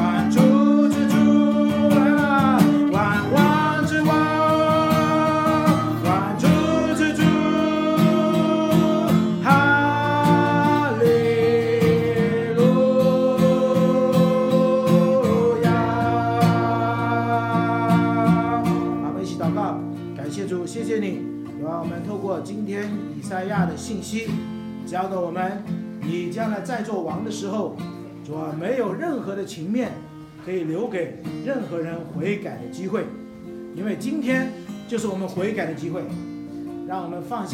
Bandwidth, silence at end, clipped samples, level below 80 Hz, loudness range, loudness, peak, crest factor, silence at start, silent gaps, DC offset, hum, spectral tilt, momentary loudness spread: 16.5 kHz; 0 s; under 0.1%; -54 dBFS; 10 LU; -21 LUFS; -2 dBFS; 18 dB; 0 s; none; under 0.1%; none; -7 dB/octave; 13 LU